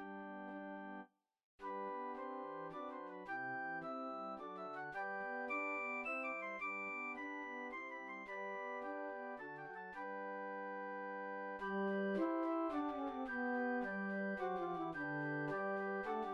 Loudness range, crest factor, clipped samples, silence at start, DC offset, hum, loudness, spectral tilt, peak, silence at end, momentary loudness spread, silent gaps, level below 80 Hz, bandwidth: 6 LU; 16 dB; under 0.1%; 0 s; under 0.1%; none; -44 LUFS; -7.5 dB/octave; -28 dBFS; 0 s; 9 LU; 1.44-1.58 s; -80 dBFS; 8.4 kHz